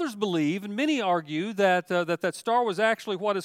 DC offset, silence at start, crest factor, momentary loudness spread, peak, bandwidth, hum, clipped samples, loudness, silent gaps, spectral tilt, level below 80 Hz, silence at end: under 0.1%; 0 s; 16 dB; 5 LU; -10 dBFS; 16 kHz; none; under 0.1%; -26 LUFS; none; -5 dB/octave; -80 dBFS; 0 s